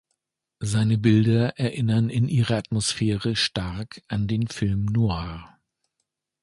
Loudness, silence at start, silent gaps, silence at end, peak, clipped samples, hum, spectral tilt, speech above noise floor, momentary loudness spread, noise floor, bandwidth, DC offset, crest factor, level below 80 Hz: -24 LUFS; 0.6 s; none; 0.95 s; -6 dBFS; under 0.1%; none; -6 dB/octave; 57 dB; 12 LU; -80 dBFS; 11.5 kHz; under 0.1%; 18 dB; -46 dBFS